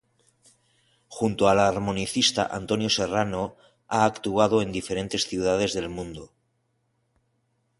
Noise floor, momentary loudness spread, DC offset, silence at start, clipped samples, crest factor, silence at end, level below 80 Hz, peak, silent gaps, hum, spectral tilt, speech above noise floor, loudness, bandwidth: -72 dBFS; 12 LU; under 0.1%; 1.1 s; under 0.1%; 22 dB; 1.55 s; -52 dBFS; -4 dBFS; none; none; -4 dB/octave; 48 dB; -24 LUFS; 11.5 kHz